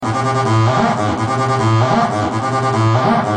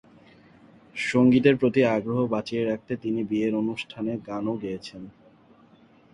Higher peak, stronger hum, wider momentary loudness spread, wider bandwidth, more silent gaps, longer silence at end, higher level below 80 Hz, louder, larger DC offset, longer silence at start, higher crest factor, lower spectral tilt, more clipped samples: first, -2 dBFS vs -6 dBFS; neither; second, 4 LU vs 16 LU; about the same, 10 kHz vs 10.5 kHz; neither; second, 0 s vs 1.05 s; first, -46 dBFS vs -62 dBFS; first, -15 LUFS vs -25 LUFS; neither; second, 0 s vs 0.95 s; second, 12 dB vs 20 dB; about the same, -6.5 dB/octave vs -7 dB/octave; neither